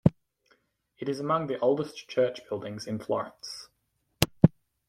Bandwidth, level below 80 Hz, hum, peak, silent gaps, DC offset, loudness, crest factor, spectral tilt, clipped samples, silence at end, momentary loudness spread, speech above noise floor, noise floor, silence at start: 16.5 kHz; -52 dBFS; none; -2 dBFS; none; under 0.1%; -29 LUFS; 28 dB; -6.5 dB/octave; under 0.1%; 0.4 s; 14 LU; 46 dB; -76 dBFS; 0.05 s